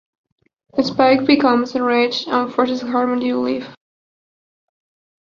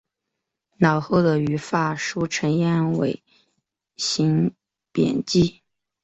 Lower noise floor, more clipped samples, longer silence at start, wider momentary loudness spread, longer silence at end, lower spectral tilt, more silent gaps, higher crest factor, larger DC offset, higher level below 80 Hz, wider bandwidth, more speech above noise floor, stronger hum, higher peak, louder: first, under -90 dBFS vs -82 dBFS; neither; about the same, 0.75 s vs 0.8 s; about the same, 9 LU vs 7 LU; first, 1.45 s vs 0.55 s; about the same, -5 dB/octave vs -5.5 dB/octave; neither; about the same, 18 dB vs 20 dB; neither; about the same, -60 dBFS vs -56 dBFS; second, 7.2 kHz vs 8.2 kHz; first, over 73 dB vs 61 dB; neither; about the same, -2 dBFS vs -4 dBFS; first, -17 LUFS vs -22 LUFS